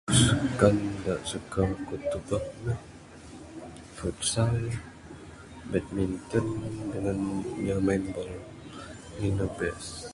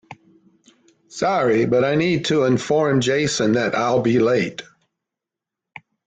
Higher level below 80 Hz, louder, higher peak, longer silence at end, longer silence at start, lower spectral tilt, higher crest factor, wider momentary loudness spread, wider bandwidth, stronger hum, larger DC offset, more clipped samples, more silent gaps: first, -46 dBFS vs -56 dBFS; second, -29 LUFS vs -19 LUFS; about the same, -6 dBFS vs -6 dBFS; second, 0 s vs 1.45 s; about the same, 0.05 s vs 0.1 s; about the same, -5 dB/octave vs -5.5 dB/octave; first, 24 dB vs 14 dB; first, 21 LU vs 5 LU; first, 11.5 kHz vs 9.4 kHz; neither; neither; neither; neither